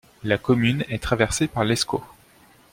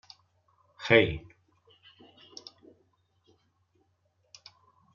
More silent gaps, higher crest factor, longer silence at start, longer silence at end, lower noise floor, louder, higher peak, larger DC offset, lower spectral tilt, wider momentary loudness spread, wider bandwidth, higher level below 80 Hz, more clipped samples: neither; second, 20 dB vs 26 dB; second, 0.25 s vs 0.8 s; second, 0.65 s vs 3.75 s; second, -54 dBFS vs -73 dBFS; about the same, -23 LUFS vs -25 LUFS; first, -4 dBFS vs -8 dBFS; neither; first, -5 dB/octave vs -3.5 dB/octave; second, 6 LU vs 29 LU; first, 16.5 kHz vs 7 kHz; first, -44 dBFS vs -58 dBFS; neither